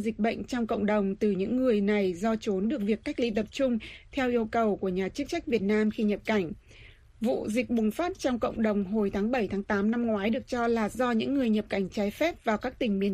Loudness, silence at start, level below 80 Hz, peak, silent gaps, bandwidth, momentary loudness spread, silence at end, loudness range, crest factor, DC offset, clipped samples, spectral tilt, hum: -28 LUFS; 0 s; -52 dBFS; -12 dBFS; none; 14.5 kHz; 4 LU; 0 s; 2 LU; 16 dB; under 0.1%; under 0.1%; -6.5 dB/octave; none